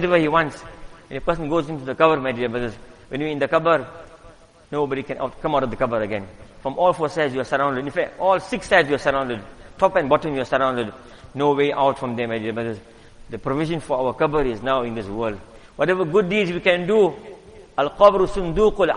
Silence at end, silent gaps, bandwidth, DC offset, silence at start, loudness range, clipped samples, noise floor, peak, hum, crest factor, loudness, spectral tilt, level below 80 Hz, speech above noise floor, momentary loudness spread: 0 s; none; 11 kHz; under 0.1%; 0 s; 4 LU; under 0.1%; -47 dBFS; 0 dBFS; none; 20 dB; -21 LUFS; -6 dB/octave; -44 dBFS; 27 dB; 13 LU